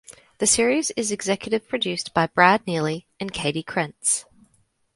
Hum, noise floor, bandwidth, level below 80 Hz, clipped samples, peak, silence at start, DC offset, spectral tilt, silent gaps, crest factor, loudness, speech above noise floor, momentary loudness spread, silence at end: none; -65 dBFS; 11.5 kHz; -58 dBFS; under 0.1%; 0 dBFS; 0.1 s; under 0.1%; -3 dB/octave; none; 24 dB; -22 LUFS; 42 dB; 9 LU; 0.75 s